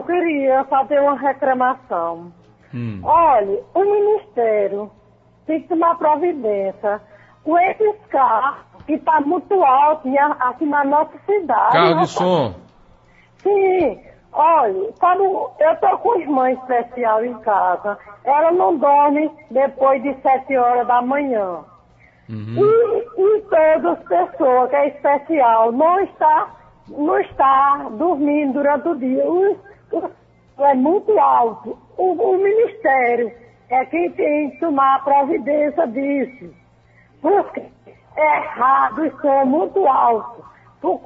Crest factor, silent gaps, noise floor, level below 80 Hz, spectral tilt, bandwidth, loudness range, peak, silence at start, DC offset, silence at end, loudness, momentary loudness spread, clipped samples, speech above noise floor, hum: 16 dB; none; -52 dBFS; -58 dBFS; -7 dB/octave; 7.8 kHz; 3 LU; -2 dBFS; 0 s; under 0.1%; 0.05 s; -17 LUFS; 11 LU; under 0.1%; 35 dB; none